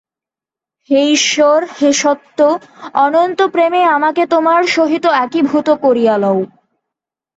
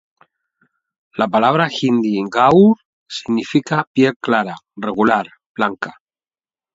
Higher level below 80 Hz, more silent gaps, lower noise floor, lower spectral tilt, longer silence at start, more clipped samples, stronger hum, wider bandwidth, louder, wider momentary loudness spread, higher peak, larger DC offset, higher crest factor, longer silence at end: about the same, -62 dBFS vs -60 dBFS; second, none vs 2.85-3.06 s, 3.87-3.95 s, 4.16-4.20 s, 5.46-5.55 s; about the same, -88 dBFS vs under -90 dBFS; second, -3 dB/octave vs -6.5 dB/octave; second, 0.9 s vs 1.15 s; neither; neither; about the same, 8.2 kHz vs 7.8 kHz; first, -13 LUFS vs -16 LUFS; second, 5 LU vs 16 LU; about the same, 0 dBFS vs 0 dBFS; neither; second, 12 dB vs 18 dB; about the same, 0.9 s vs 0.85 s